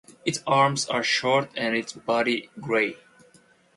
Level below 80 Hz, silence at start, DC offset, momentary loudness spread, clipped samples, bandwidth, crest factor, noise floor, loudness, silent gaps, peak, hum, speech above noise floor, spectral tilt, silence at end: -68 dBFS; 0.1 s; under 0.1%; 7 LU; under 0.1%; 11.5 kHz; 18 dB; -58 dBFS; -24 LUFS; none; -8 dBFS; none; 34 dB; -3.5 dB/octave; 0.8 s